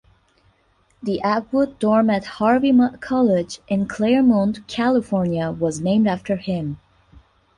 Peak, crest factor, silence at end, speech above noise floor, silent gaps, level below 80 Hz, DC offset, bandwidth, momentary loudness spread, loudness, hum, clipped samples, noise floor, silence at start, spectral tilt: -6 dBFS; 14 dB; 0.8 s; 42 dB; none; -52 dBFS; under 0.1%; 10.5 kHz; 9 LU; -20 LUFS; none; under 0.1%; -61 dBFS; 1.05 s; -7 dB/octave